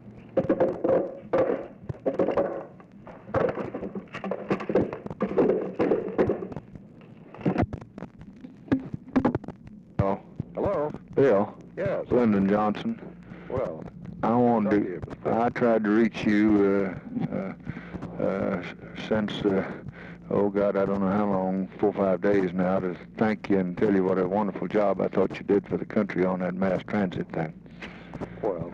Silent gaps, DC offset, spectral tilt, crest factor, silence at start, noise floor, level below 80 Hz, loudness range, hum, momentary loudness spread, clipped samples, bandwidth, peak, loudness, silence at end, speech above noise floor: none; under 0.1%; -8.5 dB/octave; 14 dB; 0.05 s; -48 dBFS; -54 dBFS; 5 LU; none; 16 LU; under 0.1%; 7.2 kHz; -12 dBFS; -26 LUFS; 0 s; 23 dB